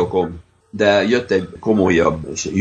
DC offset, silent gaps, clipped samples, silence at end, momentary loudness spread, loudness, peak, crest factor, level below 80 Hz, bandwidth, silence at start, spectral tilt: under 0.1%; none; under 0.1%; 0 s; 10 LU; -17 LUFS; 0 dBFS; 16 dB; -44 dBFS; 9 kHz; 0 s; -5 dB/octave